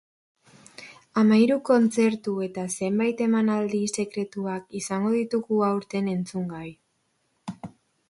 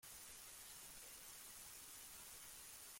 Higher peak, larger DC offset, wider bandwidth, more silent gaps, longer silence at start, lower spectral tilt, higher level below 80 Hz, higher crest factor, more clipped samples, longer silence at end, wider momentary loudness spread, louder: first, -8 dBFS vs -42 dBFS; neither; second, 11.5 kHz vs 16.5 kHz; neither; first, 0.8 s vs 0 s; first, -6 dB/octave vs 0 dB/octave; first, -68 dBFS vs -76 dBFS; about the same, 18 dB vs 16 dB; neither; first, 0.4 s vs 0 s; first, 21 LU vs 1 LU; first, -25 LUFS vs -55 LUFS